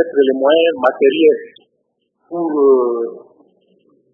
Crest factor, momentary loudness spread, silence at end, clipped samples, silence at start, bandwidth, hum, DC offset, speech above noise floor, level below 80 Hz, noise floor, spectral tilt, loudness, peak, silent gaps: 16 dB; 11 LU; 0.95 s; under 0.1%; 0 s; 3.8 kHz; none; under 0.1%; 54 dB; -74 dBFS; -68 dBFS; -7 dB/octave; -14 LUFS; 0 dBFS; none